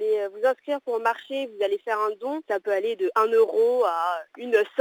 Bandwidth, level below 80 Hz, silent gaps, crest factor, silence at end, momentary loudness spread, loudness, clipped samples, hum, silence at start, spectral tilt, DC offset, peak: 19 kHz; -88 dBFS; none; 16 dB; 0 s; 8 LU; -25 LUFS; under 0.1%; none; 0 s; -3.5 dB/octave; under 0.1%; -8 dBFS